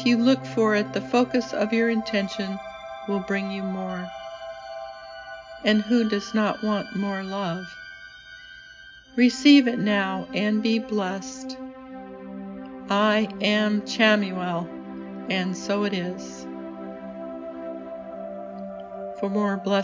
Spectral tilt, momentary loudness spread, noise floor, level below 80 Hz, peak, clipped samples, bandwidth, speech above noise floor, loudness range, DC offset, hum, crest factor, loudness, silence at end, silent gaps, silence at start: -5.5 dB/octave; 18 LU; -47 dBFS; -62 dBFS; -4 dBFS; under 0.1%; 7.6 kHz; 24 dB; 9 LU; under 0.1%; none; 20 dB; -24 LUFS; 0 s; none; 0 s